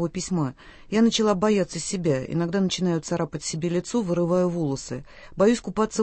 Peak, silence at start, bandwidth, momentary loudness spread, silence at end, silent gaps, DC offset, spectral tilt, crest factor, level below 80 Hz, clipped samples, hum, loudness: -6 dBFS; 0 s; 8.8 kHz; 7 LU; 0 s; none; under 0.1%; -5.5 dB/octave; 18 dB; -52 dBFS; under 0.1%; none; -24 LUFS